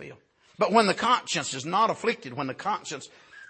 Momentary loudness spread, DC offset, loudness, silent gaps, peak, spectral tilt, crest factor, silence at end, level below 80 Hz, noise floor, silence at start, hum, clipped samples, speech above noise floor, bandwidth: 16 LU; under 0.1%; -26 LUFS; none; -6 dBFS; -3.5 dB/octave; 20 dB; 0.05 s; -70 dBFS; -50 dBFS; 0 s; none; under 0.1%; 24 dB; 8.8 kHz